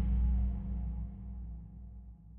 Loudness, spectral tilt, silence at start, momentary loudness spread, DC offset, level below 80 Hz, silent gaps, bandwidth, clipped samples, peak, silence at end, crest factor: -38 LUFS; -11.5 dB/octave; 0 s; 19 LU; under 0.1%; -36 dBFS; none; 2.3 kHz; under 0.1%; -22 dBFS; 0 s; 12 dB